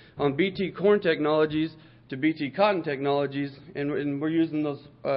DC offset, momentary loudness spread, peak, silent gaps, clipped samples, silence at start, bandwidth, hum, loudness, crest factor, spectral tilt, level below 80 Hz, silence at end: under 0.1%; 10 LU; -8 dBFS; none; under 0.1%; 0.15 s; 5.6 kHz; none; -26 LUFS; 18 dB; -10.5 dB/octave; -62 dBFS; 0 s